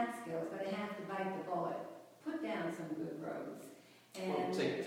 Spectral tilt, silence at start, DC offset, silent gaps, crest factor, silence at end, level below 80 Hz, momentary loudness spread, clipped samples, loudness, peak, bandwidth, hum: -5.5 dB/octave; 0 s; under 0.1%; none; 16 dB; 0 s; -84 dBFS; 13 LU; under 0.1%; -41 LUFS; -24 dBFS; 20 kHz; none